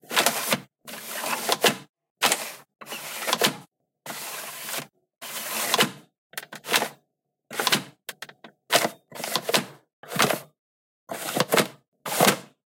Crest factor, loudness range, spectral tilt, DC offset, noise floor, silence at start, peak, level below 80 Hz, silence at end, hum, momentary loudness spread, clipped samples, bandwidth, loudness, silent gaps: 26 dB; 3 LU; -1.5 dB/octave; under 0.1%; -77 dBFS; 0.1 s; -2 dBFS; -74 dBFS; 0.2 s; none; 17 LU; under 0.1%; 17 kHz; -25 LUFS; 1.89-1.94 s, 2.10-2.15 s, 6.18-6.30 s, 9.93-10.03 s, 10.59-11.07 s, 11.88-11.92 s